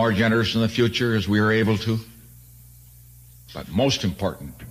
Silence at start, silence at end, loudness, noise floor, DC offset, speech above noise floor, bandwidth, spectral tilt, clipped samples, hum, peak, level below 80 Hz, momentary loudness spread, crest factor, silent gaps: 0 s; 0 s; -22 LUFS; -47 dBFS; under 0.1%; 26 dB; 15.5 kHz; -5.5 dB/octave; under 0.1%; 60 Hz at -50 dBFS; -8 dBFS; -48 dBFS; 10 LU; 14 dB; none